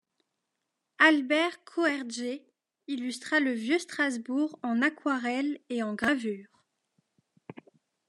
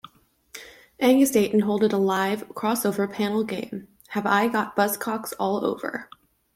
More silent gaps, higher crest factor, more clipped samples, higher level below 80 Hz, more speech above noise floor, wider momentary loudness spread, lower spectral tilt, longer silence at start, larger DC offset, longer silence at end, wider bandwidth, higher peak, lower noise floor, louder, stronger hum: neither; first, 24 dB vs 18 dB; neither; second, -76 dBFS vs -66 dBFS; first, 54 dB vs 30 dB; second, 13 LU vs 17 LU; second, -3.5 dB/octave vs -5 dB/octave; first, 1 s vs 0.55 s; neither; about the same, 0.55 s vs 0.5 s; second, 12 kHz vs 16.5 kHz; about the same, -8 dBFS vs -6 dBFS; first, -83 dBFS vs -53 dBFS; second, -28 LUFS vs -24 LUFS; neither